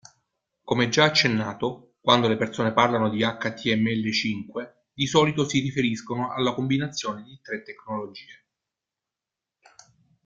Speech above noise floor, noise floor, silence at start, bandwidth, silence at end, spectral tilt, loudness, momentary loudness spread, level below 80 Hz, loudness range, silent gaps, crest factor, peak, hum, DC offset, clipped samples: 64 dB; -88 dBFS; 0.65 s; 7.8 kHz; 1.95 s; -4.5 dB/octave; -24 LUFS; 15 LU; -62 dBFS; 10 LU; none; 22 dB; -4 dBFS; none; under 0.1%; under 0.1%